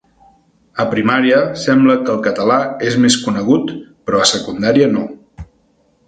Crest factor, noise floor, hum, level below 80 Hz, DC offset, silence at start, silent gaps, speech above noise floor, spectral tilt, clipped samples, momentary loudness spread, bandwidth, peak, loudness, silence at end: 16 dB; -57 dBFS; none; -48 dBFS; under 0.1%; 0.75 s; none; 43 dB; -4.5 dB/octave; under 0.1%; 9 LU; 9.4 kHz; 0 dBFS; -14 LUFS; 0.65 s